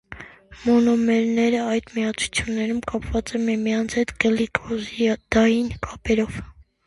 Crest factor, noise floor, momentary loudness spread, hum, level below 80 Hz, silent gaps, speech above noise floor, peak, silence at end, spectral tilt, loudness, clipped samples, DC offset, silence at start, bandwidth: 20 dB; -42 dBFS; 10 LU; none; -42 dBFS; none; 20 dB; -2 dBFS; 0.25 s; -5 dB/octave; -22 LUFS; under 0.1%; under 0.1%; 0.1 s; 11.5 kHz